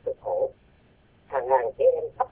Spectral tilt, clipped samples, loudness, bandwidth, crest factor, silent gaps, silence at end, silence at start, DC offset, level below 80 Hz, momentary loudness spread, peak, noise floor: -9 dB/octave; under 0.1%; -26 LUFS; 3.5 kHz; 18 dB; none; 0.05 s; 0.05 s; under 0.1%; -60 dBFS; 9 LU; -8 dBFS; -59 dBFS